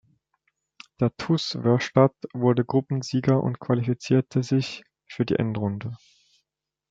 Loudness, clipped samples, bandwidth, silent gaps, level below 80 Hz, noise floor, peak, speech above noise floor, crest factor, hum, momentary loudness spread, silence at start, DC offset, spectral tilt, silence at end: -24 LUFS; under 0.1%; 7.8 kHz; none; -64 dBFS; -83 dBFS; -4 dBFS; 60 dB; 22 dB; none; 12 LU; 1 s; under 0.1%; -7 dB/octave; 0.95 s